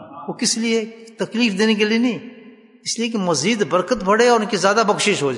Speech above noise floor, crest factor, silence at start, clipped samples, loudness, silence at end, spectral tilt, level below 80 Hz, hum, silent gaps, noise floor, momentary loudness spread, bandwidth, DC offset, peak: 26 dB; 16 dB; 0 s; under 0.1%; -18 LUFS; 0 s; -3.5 dB/octave; -56 dBFS; none; none; -44 dBFS; 11 LU; 11 kHz; under 0.1%; -4 dBFS